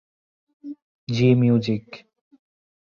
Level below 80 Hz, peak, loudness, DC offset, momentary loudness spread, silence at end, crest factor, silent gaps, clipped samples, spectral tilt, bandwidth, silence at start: -60 dBFS; -4 dBFS; -20 LUFS; under 0.1%; 25 LU; 0.95 s; 20 dB; 0.82-1.07 s; under 0.1%; -8 dB/octave; 7 kHz; 0.65 s